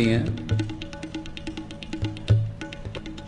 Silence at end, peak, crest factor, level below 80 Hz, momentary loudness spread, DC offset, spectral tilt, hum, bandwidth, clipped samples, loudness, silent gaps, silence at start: 0 s; -6 dBFS; 20 dB; -42 dBFS; 12 LU; under 0.1%; -7 dB/octave; none; 9.8 kHz; under 0.1%; -29 LUFS; none; 0 s